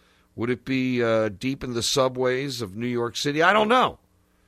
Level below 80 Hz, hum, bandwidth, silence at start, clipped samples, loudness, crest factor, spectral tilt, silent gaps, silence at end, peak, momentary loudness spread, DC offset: -56 dBFS; none; 15.5 kHz; 0.35 s; under 0.1%; -23 LUFS; 20 dB; -4 dB/octave; none; 0.5 s; -4 dBFS; 10 LU; under 0.1%